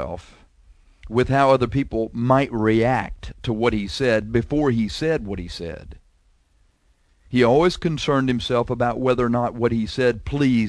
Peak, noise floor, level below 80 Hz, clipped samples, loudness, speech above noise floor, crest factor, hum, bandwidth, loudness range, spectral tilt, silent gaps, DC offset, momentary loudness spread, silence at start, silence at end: -4 dBFS; -61 dBFS; -40 dBFS; under 0.1%; -21 LUFS; 40 dB; 18 dB; none; 11 kHz; 4 LU; -7 dB/octave; none; under 0.1%; 13 LU; 0 s; 0 s